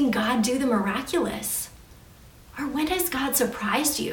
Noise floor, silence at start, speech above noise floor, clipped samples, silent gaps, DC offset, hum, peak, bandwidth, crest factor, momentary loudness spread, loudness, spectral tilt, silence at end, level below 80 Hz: -49 dBFS; 0 s; 24 dB; under 0.1%; none; under 0.1%; none; -8 dBFS; 18 kHz; 18 dB; 7 LU; -25 LUFS; -3 dB/octave; 0 s; -50 dBFS